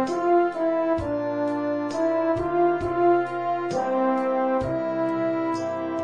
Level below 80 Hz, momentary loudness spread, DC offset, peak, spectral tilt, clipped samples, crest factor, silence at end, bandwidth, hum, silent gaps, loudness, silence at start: -52 dBFS; 5 LU; 0.2%; -10 dBFS; -7 dB/octave; under 0.1%; 12 dB; 0 s; 9.4 kHz; none; none; -24 LUFS; 0 s